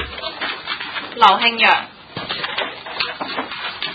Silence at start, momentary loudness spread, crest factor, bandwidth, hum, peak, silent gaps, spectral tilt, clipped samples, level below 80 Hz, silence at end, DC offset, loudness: 0 s; 14 LU; 20 dB; 8 kHz; none; 0 dBFS; none; -4 dB/octave; under 0.1%; -50 dBFS; 0 s; under 0.1%; -18 LUFS